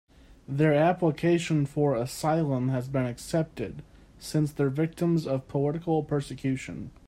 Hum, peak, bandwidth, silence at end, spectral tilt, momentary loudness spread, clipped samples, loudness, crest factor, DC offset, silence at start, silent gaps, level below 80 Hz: none; -10 dBFS; 16 kHz; 0.2 s; -7 dB/octave; 10 LU; under 0.1%; -27 LUFS; 16 dB; under 0.1%; 0.5 s; none; -56 dBFS